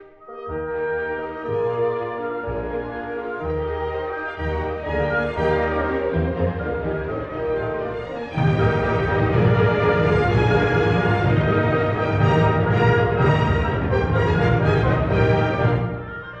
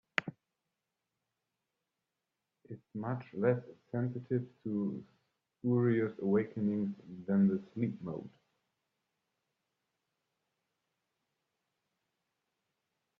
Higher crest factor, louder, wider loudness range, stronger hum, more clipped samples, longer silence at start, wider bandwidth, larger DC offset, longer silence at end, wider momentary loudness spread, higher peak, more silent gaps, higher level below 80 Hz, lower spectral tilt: second, 16 dB vs 28 dB; first, -21 LUFS vs -35 LUFS; second, 7 LU vs 12 LU; neither; neither; second, 0 s vs 0.2 s; about the same, 7 kHz vs 7 kHz; neither; second, 0 s vs 4.9 s; second, 10 LU vs 16 LU; first, -4 dBFS vs -10 dBFS; neither; first, -34 dBFS vs -78 dBFS; about the same, -8.5 dB/octave vs -7.5 dB/octave